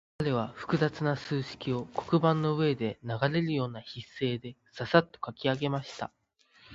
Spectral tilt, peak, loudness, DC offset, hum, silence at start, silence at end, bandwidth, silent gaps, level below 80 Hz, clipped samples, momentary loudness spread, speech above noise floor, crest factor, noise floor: -7 dB/octave; -6 dBFS; -30 LUFS; under 0.1%; none; 0.2 s; 0 s; 7.8 kHz; none; -64 dBFS; under 0.1%; 14 LU; 32 dB; 24 dB; -62 dBFS